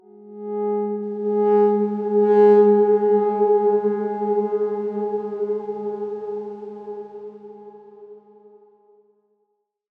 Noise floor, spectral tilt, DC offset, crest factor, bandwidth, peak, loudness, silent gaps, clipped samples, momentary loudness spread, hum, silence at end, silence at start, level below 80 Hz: -72 dBFS; -10 dB/octave; under 0.1%; 16 dB; 3.3 kHz; -6 dBFS; -20 LUFS; none; under 0.1%; 20 LU; none; 1.8 s; 0.2 s; -78 dBFS